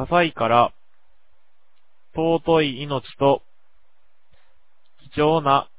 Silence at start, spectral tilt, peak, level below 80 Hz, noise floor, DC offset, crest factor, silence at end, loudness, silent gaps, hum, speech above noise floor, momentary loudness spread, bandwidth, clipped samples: 0 s; -10 dB/octave; -4 dBFS; -52 dBFS; -69 dBFS; 0.8%; 20 dB; 0.15 s; -21 LUFS; none; none; 50 dB; 10 LU; 4 kHz; under 0.1%